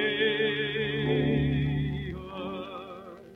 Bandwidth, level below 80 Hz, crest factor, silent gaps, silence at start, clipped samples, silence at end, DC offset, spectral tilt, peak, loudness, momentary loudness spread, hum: 4.2 kHz; -46 dBFS; 14 dB; none; 0 s; under 0.1%; 0 s; under 0.1%; -8 dB/octave; -14 dBFS; -29 LUFS; 14 LU; none